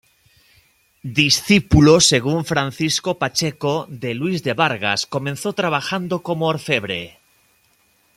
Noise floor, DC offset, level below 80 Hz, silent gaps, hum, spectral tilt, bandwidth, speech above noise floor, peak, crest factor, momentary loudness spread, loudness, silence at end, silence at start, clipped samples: -60 dBFS; under 0.1%; -40 dBFS; none; none; -4 dB/octave; 15.5 kHz; 42 dB; 0 dBFS; 20 dB; 12 LU; -18 LUFS; 1.1 s; 1.05 s; under 0.1%